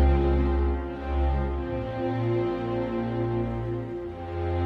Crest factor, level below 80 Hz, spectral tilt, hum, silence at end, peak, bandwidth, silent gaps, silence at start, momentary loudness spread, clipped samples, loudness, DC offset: 14 dB; -30 dBFS; -10 dB/octave; none; 0 s; -12 dBFS; 5 kHz; none; 0 s; 8 LU; under 0.1%; -28 LUFS; under 0.1%